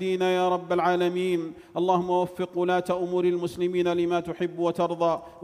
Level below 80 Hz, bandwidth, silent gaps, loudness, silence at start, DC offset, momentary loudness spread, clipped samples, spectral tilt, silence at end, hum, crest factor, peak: -64 dBFS; 13 kHz; none; -26 LUFS; 0 s; under 0.1%; 5 LU; under 0.1%; -6.5 dB/octave; 0 s; none; 14 dB; -10 dBFS